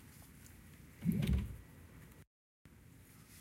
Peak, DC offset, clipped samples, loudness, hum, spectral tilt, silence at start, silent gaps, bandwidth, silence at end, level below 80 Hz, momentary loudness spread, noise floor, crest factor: -22 dBFS; under 0.1%; under 0.1%; -39 LUFS; none; -7 dB/octave; 0 s; 2.27-2.65 s; 16.5 kHz; 0 s; -50 dBFS; 24 LU; -60 dBFS; 20 dB